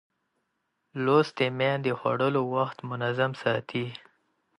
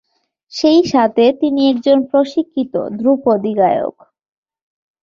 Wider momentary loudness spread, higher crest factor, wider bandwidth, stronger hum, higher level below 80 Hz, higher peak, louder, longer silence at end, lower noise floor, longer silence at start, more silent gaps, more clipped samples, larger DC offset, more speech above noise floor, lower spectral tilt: about the same, 10 LU vs 8 LU; first, 20 dB vs 14 dB; first, 11.5 kHz vs 7.4 kHz; neither; second, -72 dBFS vs -58 dBFS; second, -8 dBFS vs -2 dBFS; second, -27 LUFS vs -14 LUFS; second, 0.6 s vs 1.15 s; first, -78 dBFS vs -54 dBFS; first, 0.95 s vs 0.55 s; neither; neither; neither; first, 51 dB vs 40 dB; about the same, -7 dB/octave vs -6 dB/octave